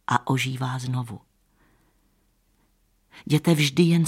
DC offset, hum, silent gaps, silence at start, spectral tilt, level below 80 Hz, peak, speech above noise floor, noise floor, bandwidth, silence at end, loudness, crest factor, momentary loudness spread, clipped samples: under 0.1%; none; none; 0.1 s; -5.5 dB/octave; -64 dBFS; -6 dBFS; 43 dB; -66 dBFS; 16 kHz; 0 s; -23 LUFS; 20 dB; 19 LU; under 0.1%